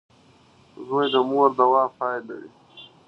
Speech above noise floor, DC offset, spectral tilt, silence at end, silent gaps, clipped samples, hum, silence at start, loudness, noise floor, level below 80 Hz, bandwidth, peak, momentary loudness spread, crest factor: 34 dB; under 0.1%; -6.5 dB/octave; 0.25 s; none; under 0.1%; none; 0.8 s; -21 LUFS; -55 dBFS; -72 dBFS; 6 kHz; -4 dBFS; 21 LU; 20 dB